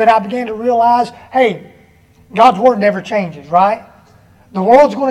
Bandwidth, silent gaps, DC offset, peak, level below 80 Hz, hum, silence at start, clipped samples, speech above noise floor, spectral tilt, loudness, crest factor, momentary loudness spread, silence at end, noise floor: 11.5 kHz; none; under 0.1%; 0 dBFS; -54 dBFS; none; 0 s; under 0.1%; 35 dB; -6.5 dB/octave; -13 LUFS; 14 dB; 12 LU; 0 s; -47 dBFS